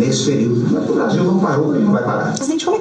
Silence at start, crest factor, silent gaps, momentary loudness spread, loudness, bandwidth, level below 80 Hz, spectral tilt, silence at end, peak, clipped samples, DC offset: 0 s; 12 dB; none; 4 LU; -16 LUFS; 9.8 kHz; -60 dBFS; -6 dB/octave; 0 s; -4 dBFS; under 0.1%; under 0.1%